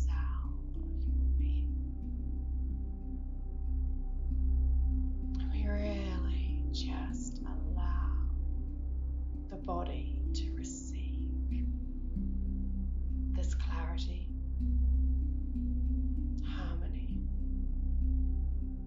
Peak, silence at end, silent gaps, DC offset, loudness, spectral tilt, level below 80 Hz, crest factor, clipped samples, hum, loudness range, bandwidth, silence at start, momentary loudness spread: -22 dBFS; 0 s; none; under 0.1%; -37 LUFS; -7.5 dB/octave; -34 dBFS; 10 dB; under 0.1%; none; 3 LU; 7.6 kHz; 0 s; 8 LU